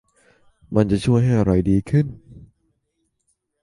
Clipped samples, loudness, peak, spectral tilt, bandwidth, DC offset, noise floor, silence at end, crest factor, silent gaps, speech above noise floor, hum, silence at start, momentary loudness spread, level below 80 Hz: under 0.1%; -19 LUFS; -2 dBFS; -8.5 dB/octave; 11.5 kHz; under 0.1%; -72 dBFS; 1.3 s; 20 dB; none; 55 dB; none; 0.7 s; 5 LU; -40 dBFS